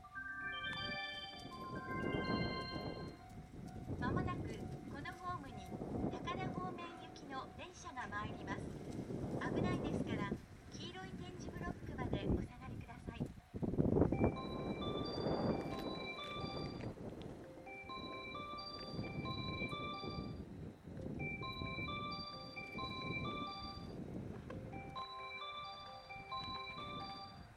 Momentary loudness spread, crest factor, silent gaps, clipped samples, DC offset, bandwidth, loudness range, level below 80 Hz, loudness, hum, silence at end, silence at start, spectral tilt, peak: 11 LU; 24 dB; none; under 0.1%; under 0.1%; 15 kHz; 7 LU; -58 dBFS; -44 LUFS; none; 0 s; 0 s; -6.5 dB/octave; -18 dBFS